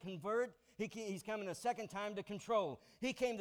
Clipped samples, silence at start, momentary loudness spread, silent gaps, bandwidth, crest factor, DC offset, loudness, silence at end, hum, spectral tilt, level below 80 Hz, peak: under 0.1%; 0 s; 7 LU; none; 18 kHz; 16 dB; under 0.1%; -42 LUFS; 0 s; none; -4.5 dB/octave; -74 dBFS; -26 dBFS